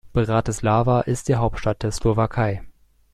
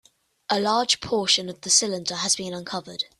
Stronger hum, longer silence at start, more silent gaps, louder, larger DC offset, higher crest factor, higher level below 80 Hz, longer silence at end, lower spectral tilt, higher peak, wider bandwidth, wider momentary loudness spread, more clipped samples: neither; second, 0.05 s vs 0.5 s; neither; about the same, -22 LUFS vs -22 LUFS; neither; second, 14 dB vs 20 dB; first, -36 dBFS vs -62 dBFS; first, 0.45 s vs 0.15 s; first, -6.5 dB/octave vs -1.5 dB/octave; about the same, -6 dBFS vs -4 dBFS; about the same, 13 kHz vs 13.5 kHz; second, 6 LU vs 12 LU; neither